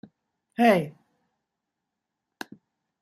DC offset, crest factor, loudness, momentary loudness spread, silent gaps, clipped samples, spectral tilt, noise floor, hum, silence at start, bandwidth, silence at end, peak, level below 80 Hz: under 0.1%; 24 dB; -22 LUFS; 21 LU; none; under 0.1%; -6.5 dB/octave; -84 dBFS; none; 0.6 s; 13.5 kHz; 2.1 s; -6 dBFS; -76 dBFS